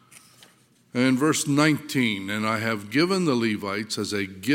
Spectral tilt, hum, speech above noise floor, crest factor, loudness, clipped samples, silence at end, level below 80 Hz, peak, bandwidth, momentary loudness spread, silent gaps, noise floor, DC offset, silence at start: -4.5 dB/octave; none; 35 dB; 20 dB; -24 LUFS; under 0.1%; 0 s; -72 dBFS; -4 dBFS; 17 kHz; 8 LU; none; -58 dBFS; under 0.1%; 0.15 s